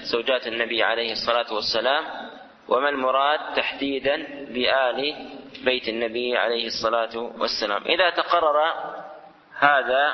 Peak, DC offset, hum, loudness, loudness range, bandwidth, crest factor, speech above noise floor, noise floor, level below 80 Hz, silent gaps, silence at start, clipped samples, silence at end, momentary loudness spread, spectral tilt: -2 dBFS; under 0.1%; none; -23 LUFS; 2 LU; 6.4 kHz; 22 dB; 21 dB; -44 dBFS; -60 dBFS; none; 0 s; under 0.1%; 0 s; 12 LU; -3 dB/octave